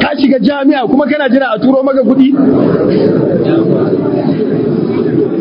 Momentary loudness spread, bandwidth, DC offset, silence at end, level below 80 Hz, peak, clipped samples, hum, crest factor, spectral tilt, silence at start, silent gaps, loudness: 4 LU; 5.4 kHz; under 0.1%; 0 s; -44 dBFS; 0 dBFS; 0.4%; none; 10 dB; -10 dB/octave; 0 s; none; -10 LUFS